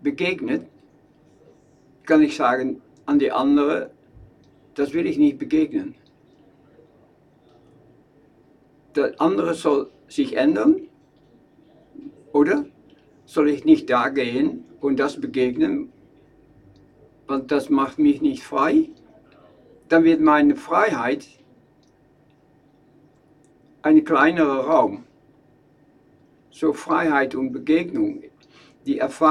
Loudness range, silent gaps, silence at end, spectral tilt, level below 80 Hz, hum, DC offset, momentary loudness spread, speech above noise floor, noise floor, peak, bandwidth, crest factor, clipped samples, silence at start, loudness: 5 LU; none; 0 s; -6 dB/octave; -60 dBFS; none; under 0.1%; 12 LU; 38 dB; -57 dBFS; -2 dBFS; 10.5 kHz; 20 dB; under 0.1%; 0.05 s; -21 LUFS